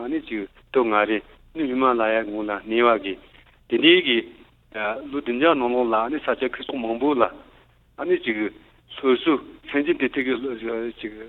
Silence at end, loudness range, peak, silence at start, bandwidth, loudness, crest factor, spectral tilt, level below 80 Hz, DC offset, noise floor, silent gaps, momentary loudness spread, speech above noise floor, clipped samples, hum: 0 s; 4 LU; -2 dBFS; 0 s; 4.2 kHz; -22 LUFS; 22 dB; -7 dB/octave; -56 dBFS; under 0.1%; -55 dBFS; none; 12 LU; 32 dB; under 0.1%; none